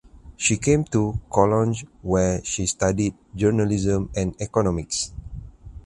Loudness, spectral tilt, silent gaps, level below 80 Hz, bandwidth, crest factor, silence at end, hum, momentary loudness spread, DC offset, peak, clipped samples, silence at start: -23 LUFS; -5 dB/octave; none; -40 dBFS; 11.5 kHz; 20 dB; 0.05 s; none; 7 LU; under 0.1%; -2 dBFS; under 0.1%; 0.25 s